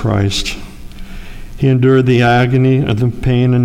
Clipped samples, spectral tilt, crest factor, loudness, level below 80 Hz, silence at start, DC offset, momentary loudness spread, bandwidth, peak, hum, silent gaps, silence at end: under 0.1%; -6.5 dB/octave; 12 dB; -13 LUFS; -30 dBFS; 0 s; under 0.1%; 20 LU; 11 kHz; -2 dBFS; none; none; 0 s